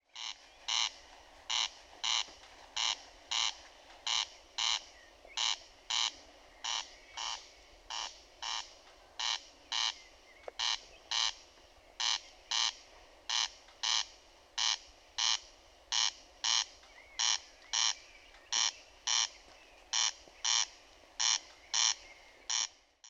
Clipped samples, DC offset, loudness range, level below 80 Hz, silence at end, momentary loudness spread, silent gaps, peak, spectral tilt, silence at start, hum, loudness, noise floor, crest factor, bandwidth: under 0.1%; under 0.1%; 6 LU; -68 dBFS; 0 s; 14 LU; none; -14 dBFS; 3.5 dB/octave; 0.15 s; none; -34 LUFS; -60 dBFS; 24 dB; 14 kHz